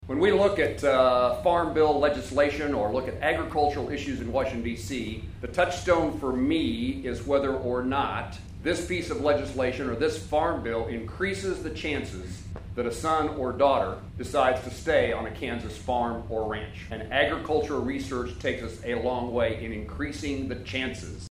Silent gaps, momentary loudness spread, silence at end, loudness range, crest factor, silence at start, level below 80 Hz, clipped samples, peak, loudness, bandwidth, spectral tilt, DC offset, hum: none; 10 LU; 0 s; 5 LU; 20 dB; 0 s; -44 dBFS; under 0.1%; -8 dBFS; -27 LUFS; 15.5 kHz; -5.5 dB/octave; under 0.1%; none